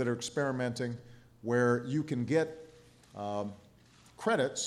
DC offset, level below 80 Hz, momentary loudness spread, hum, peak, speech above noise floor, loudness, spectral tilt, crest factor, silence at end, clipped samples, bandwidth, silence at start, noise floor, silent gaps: under 0.1%; -70 dBFS; 14 LU; none; -16 dBFS; 29 dB; -33 LUFS; -5 dB/octave; 18 dB; 0 s; under 0.1%; 13 kHz; 0 s; -60 dBFS; none